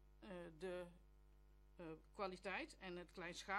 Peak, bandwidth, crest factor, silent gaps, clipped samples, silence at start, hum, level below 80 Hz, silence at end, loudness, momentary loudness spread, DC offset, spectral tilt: -32 dBFS; 13 kHz; 22 dB; none; under 0.1%; 0 s; 50 Hz at -70 dBFS; -70 dBFS; 0 s; -53 LUFS; 9 LU; under 0.1%; -4.5 dB/octave